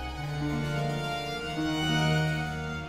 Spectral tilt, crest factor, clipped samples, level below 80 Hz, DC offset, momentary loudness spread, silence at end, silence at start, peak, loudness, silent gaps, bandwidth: -5.5 dB/octave; 16 dB; under 0.1%; -46 dBFS; under 0.1%; 7 LU; 0 s; 0 s; -14 dBFS; -30 LUFS; none; 15.5 kHz